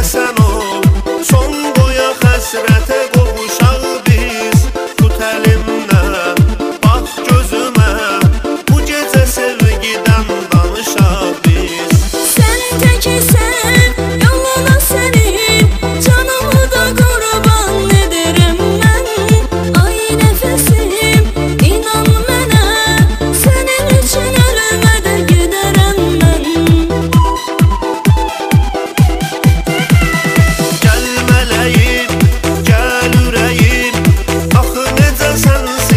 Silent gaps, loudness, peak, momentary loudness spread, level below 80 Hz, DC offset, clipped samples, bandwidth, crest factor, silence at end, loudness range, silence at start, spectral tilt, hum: none; -11 LUFS; 0 dBFS; 3 LU; -18 dBFS; under 0.1%; 0.3%; 16 kHz; 10 dB; 0 s; 2 LU; 0 s; -5 dB/octave; none